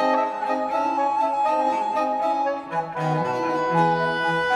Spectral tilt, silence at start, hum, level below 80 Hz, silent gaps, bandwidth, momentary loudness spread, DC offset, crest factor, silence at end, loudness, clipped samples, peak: -6 dB/octave; 0 s; none; -62 dBFS; none; 11.5 kHz; 5 LU; under 0.1%; 14 dB; 0 s; -23 LUFS; under 0.1%; -8 dBFS